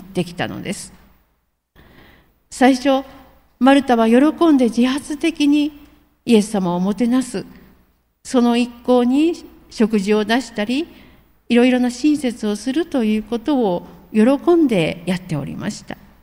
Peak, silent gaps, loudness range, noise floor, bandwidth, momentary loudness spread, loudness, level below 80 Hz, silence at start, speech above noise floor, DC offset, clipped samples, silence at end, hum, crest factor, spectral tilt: -2 dBFS; none; 4 LU; -66 dBFS; 16 kHz; 14 LU; -17 LUFS; -50 dBFS; 0 s; 49 dB; under 0.1%; under 0.1%; 0.3 s; none; 16 dB; -5.5 dB/octave